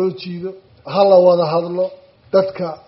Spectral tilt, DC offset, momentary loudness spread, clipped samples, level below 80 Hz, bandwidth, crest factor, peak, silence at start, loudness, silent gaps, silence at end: -5.5 dB/octave; under 0.1%; 17 LU; under 0.1%; -62 dBFS; 5.8 kHz; 16 dB; 0 dBFS; 0 s; -16 LUFS; none; 0.1 s